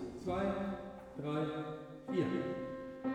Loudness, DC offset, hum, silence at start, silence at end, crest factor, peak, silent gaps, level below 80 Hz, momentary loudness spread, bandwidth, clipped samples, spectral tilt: -39 LUFS; under 0.1%; none; 0 s; 0 s; 18 dB; -22 dBFS; none; -62 dBFS; 9 LU; 11.5 kHz; under 0.1%; -7.5 dB/octave